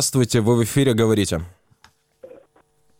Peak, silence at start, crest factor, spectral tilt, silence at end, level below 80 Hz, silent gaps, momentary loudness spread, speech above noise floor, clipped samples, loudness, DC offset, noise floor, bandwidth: -6 dBFS; 0 s; 16 dB; -5 dB/octave; 0.75 s; -48 dBFS; none; 9 LU; 41 dB; under 0.1%; -19 LUFS; under 0.1%; -60 dBFS; 17 kHz